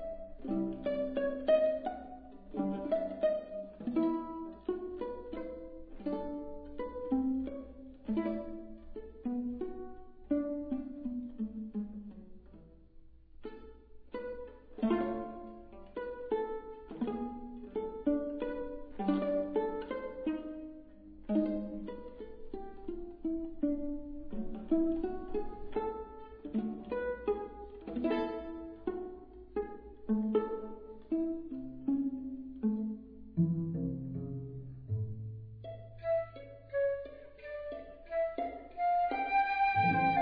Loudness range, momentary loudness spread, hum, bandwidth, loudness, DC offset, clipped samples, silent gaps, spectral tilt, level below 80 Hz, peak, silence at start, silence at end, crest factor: 6 LU; 16 LU; none; 5.2 kHz; -37 LUFS; under 0.1%; under 0.1%; none; -6.5 dB/octave; -54 dBFS; -18 dBFS; 0 s; 0 s; 18 dB